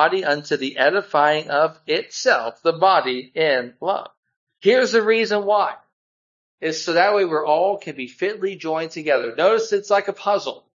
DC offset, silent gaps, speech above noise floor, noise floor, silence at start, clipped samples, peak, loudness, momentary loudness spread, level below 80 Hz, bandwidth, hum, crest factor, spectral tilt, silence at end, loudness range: under 0.1%; 4.17-4.23 s, 4.36-4.47 s, 5.93-6.58 s; over 70 dB; under -90 dBFS; 0 s; under 0.1%; -2 dBFS; -20 LUFS; 9 LU; -76 dBFS; 7.6 kHz; none; 18 dB; -3.5 dB/octave; 0.2 s; 2 LU